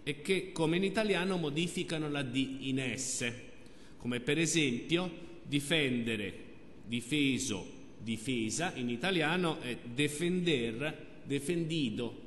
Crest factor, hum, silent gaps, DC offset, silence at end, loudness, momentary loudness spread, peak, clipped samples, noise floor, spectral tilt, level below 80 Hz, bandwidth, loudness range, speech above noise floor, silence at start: 18 dB; none; none; 0.3%; 0 s; -33 LUFS; 11 LU; -16 dBFS; under 0.1%; -55 dBFS; -4 dB/octave; -60 dBFS; 12 kHz; 2 LU; 22 dB; 0 s